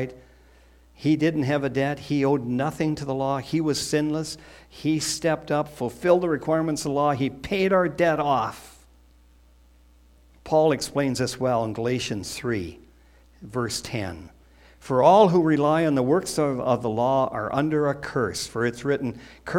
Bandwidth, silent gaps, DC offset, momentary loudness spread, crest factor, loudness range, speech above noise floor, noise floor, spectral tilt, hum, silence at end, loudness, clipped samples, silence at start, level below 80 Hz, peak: 16.5 kHz; none; under 0.1%; 10 LU; 20 dB; 6 LU; 31 dB; -55 dBFS; -5.5 dB/octave; none; 0 s; -24 LUFS; under 0.1%; 0 s; -54 dBFS; -4 dBFS